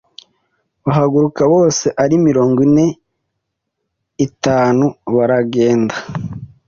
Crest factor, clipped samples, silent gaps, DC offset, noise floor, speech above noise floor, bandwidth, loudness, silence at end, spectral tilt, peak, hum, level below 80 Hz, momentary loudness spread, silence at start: 12 dB; under 0.1%; none; under 0.1%; -74 dBFS; 61 dB; 7.4 kHz; -14 LUFS; 0.2 s; -6.5 dB/octave; -2 dBFS; none; -50 dBFS; 10 LU; 0.85 s